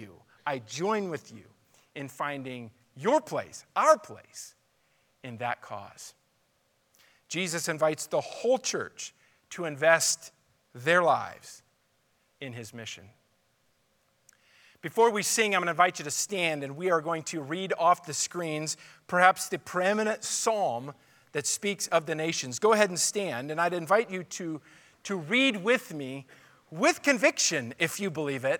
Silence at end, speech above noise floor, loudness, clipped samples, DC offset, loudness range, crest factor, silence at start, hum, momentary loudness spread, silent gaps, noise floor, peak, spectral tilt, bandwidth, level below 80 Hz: 0 s; 43 dB; -28 LUFS; under 0.1%; under 0.1%; 7 LU; 24 dB; 0 s; none; 19 LU; none; -71 dBFS; -4 dBFS; -3 dB/octave; 19 kHz; -82 dBFS